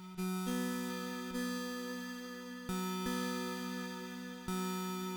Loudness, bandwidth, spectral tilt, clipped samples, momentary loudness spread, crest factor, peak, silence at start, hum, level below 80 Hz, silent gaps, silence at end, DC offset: -40 LUFS; over 20 kHz; -4.5 dB/octave; under 0.1%; 7 LU; 14 dB; -26 dBFS; 0 s; none; -64 dBFS; none; 0 s; under 0.1%